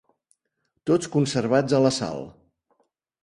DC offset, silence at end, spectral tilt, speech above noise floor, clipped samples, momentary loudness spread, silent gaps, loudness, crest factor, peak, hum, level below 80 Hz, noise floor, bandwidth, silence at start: under 0.1%; 0.95 s; -5.5 dB/octave; 54 dB; under 0.1%; 14 LU; none; -23 LUFS; 20 dB; -6 dBFS; none; -60 dBFS; -76 dBFS; 11.5 kHz; 0.85 s